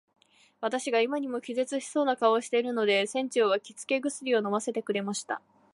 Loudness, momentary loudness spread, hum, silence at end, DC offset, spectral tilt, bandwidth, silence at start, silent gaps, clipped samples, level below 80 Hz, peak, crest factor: -29 LUFS; 7 LU; none; 0.35 s; under 0.1%; -3.5 dB/octave; 11.5 kHz; 0.6 s; none; under 0.1%; -84 dBFS; -10 dBFS; 18 dB